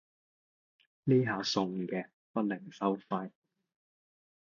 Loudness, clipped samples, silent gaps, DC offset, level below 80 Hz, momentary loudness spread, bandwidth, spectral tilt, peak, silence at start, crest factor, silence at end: -33 LUFS; under 0.1%; 2.13-2.34 s; under 0.1%; -76 dBFS; 10 LU; 7.4 kHz; -6 dB/octave; -16 dBFS; 1.05 s; 20 dB; 1.25 s